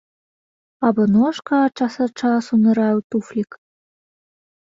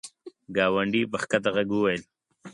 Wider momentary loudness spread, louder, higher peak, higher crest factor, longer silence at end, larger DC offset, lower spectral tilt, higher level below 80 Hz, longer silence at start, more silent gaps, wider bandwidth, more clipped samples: about the same, 9 LU vs 8 LU; first, -19 LUFS vs -26 LUFS; first, -4 dBFS vs -8 dBFS; about the same, 16 dB vs 20 dB; first, 1.25 s vs 0 s; neither; first, -7 dB/octave vs -5 dB/octave; about the same, -62 dBFS vs -62 dBFS; first, 0.8 s vs 0.05 s; first, 3.04-3.10 s vs none; second, 7.6 kHz vs 11.5 kHz; neither